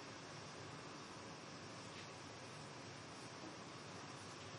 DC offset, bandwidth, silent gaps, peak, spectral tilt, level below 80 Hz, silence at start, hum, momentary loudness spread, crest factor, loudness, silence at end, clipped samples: under 0.1%; 11.5 kHz; none; -40 dBFS; -3.5 dB/octave; -84 dBFS; 0 s; none; 1 LU; 12 dB; -53 LUFS; 0 s; under 0.1%